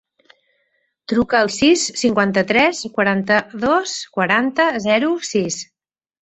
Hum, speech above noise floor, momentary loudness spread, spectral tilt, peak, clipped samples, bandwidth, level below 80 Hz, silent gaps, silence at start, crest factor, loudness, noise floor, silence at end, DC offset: none; 50 dB; 7 LU; -3.5 dB/octave; -2 dBFS; under 0.1%; 8.4 kHz; -54 dBFS; none; 1.1 s; 18 dB; -17 LUFS; -67 dBFS; 0.6 s; under 0.1%